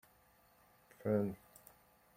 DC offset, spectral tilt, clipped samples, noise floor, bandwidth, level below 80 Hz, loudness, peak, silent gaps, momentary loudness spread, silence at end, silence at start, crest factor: under 0.1%; -8.5 dB/octave; under 0.1%; -69 dBFS; 16.5 kHz; -76 dBFS; -39 LUFS; -22 dBFS; none; 24 LU; 0.8 s; 1 s; 22 dB